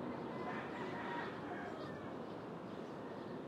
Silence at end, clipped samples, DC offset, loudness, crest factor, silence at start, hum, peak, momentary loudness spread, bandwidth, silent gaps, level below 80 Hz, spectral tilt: 0 s; under 0.1%; under 0.1%; -46 LUFS; 14 dB; 0 s; none; -32 dBFS; 5 LU; 14.5 kHz; none; -78 dBFS; -6.5 dB/octave